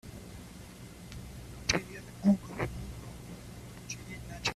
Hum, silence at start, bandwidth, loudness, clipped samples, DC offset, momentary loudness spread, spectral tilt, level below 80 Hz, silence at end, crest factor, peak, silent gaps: none; 0.05 s; 14.5 kHz; -35 LUFS; under 0.1%; under 0.1%; 19 LU; -4.5 dB/octave; -50 dBFS; 0 s; 28 dB; -8 dBFS; none